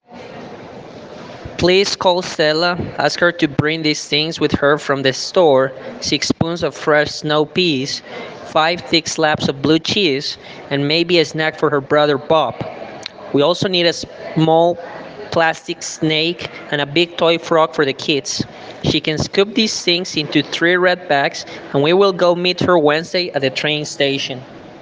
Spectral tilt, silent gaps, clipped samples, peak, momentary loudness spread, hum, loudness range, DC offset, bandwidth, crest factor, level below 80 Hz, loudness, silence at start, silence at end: -4 dB/octave; none; under 0.1%; 0 dBFS; 14 LU; none; 2 LU; under 0.1%; 10 kHz; 16 dB; -52 dBFS; -16 LUFS; 0.1 s; 0 s